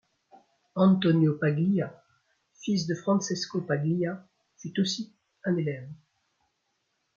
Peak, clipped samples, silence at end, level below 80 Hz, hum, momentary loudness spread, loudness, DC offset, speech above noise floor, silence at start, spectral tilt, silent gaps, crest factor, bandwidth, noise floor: -10 dBFS; under 0.1%; 1.25 s; -72 dBFS; none; 16 LU; -28 LUFS; under 0.1%; 51 dB; 0.75 s; -6 dB/octave; none; 18 dB; 7.4 kHz; -77 dBFS